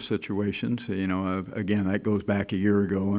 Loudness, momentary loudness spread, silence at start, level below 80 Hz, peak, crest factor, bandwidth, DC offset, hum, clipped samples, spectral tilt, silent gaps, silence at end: -27 LUFS; 6 LU; 0 s; -50 dBFS; -10 dBFS; 16 dB; 4 kHz; under 0.1%; none; under 0.1%; -6.5 dB/octave; none; 0 s